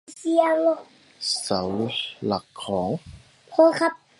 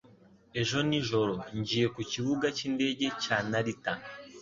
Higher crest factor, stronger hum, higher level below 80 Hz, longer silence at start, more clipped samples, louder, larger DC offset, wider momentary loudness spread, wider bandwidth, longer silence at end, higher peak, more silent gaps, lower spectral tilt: about the same, 20 dB vs 20 dB; neither; first, -56 dBFS vs -62 dBFS; about the same, 0.1 s vs 0.05 s; neither; first, -24 LUFS vs -31 LUFS; neither; first, 11 LU vs 7 LU; first, 11.5 kHz vs 7.6 kHz; first, 0.25 s vs 0 s; first, -4 dBFS vs -12 dBFS; neither; about the same, -4.5 dB/octave vs -4.5 dB/octave